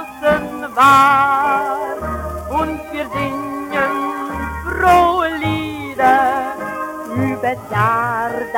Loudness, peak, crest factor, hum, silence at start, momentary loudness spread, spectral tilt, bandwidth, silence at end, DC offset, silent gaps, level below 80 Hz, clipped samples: -17 LUFS; 0 dBFS; 16 dB; none; 0 s; 12 LU; -5.5 dB/octave; 18.5 kHz; 0 s; under 0.1%; none; -40 dBFS; under 0.1%